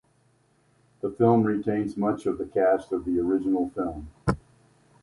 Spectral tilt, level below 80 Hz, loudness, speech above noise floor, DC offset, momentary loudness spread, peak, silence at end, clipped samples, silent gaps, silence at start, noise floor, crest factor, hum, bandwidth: -9 dB/octave; -50 dBFS; -26 LUFS; 40 dB; under 0.1%; 11 LU; -6 dBFS; 0.65 s; under 0.1%; none; 1.05 s; -65 dBFS; 20 dB; none; 11.5 kHz